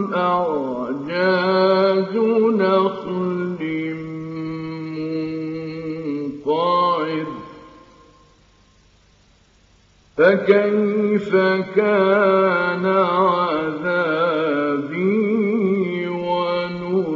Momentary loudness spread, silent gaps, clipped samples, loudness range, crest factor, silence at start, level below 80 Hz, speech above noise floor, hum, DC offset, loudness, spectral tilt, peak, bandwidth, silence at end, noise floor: 12 LU; none; under 0.1%; 9 LU; 18 dB; 0 s; -60 dBFS; 37 dB; none; under 0.1%; -19 LUFS; -4.5 dB/octave; -2 dBFS; 7.2 kHz; 0 s; -55 dBFS